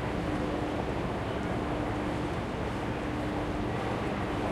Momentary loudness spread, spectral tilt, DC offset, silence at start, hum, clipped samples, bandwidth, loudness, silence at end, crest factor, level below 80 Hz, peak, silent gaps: 2 LU; -7 dB/octave; under 0.1%; 0 s; none; under 0.1%; 13.5 kHz; -33 LUFS; 0 s; 14 dB; -42 dBFS; -18 dBFS; none